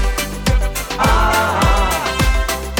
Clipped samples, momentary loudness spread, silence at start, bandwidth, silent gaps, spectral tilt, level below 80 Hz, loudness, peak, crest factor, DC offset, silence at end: under 0.1%; 5 LU; 0 s; 20 kHz; none; -4 dB/octave; -18 dBFS; -16 LUFS; -4 dBFS; 10 dB; under 0.1%; 0 s